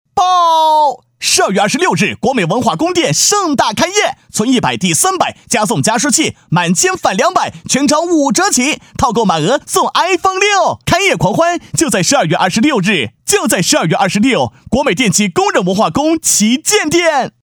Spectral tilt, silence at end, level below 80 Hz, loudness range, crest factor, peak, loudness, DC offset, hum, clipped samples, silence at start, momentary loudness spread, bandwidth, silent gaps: -3 dB/octave; 0.15 s; -44 dBFS; 1 LU; 12 dB; 0 dBFS; -12 LUFS; under 0.1%; none; under 0.1%; 0.15 s; 4 LU; over 20 kHz; none